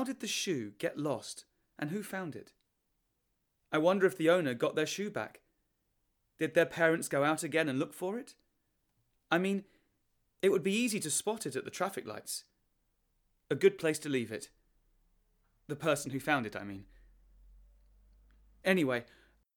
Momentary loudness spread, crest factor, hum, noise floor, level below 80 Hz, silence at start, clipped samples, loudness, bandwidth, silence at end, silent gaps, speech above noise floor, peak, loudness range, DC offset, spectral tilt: 14 LU; 22 dB; none; -80 dBFS; -70 dBFS; 0 s; under 0.1%; -33 LUFS; 19.5 kHz; 0.55 s; none; 48 dB; -12 dBFS; 5 LU; under 0.1%; -4 dB/octave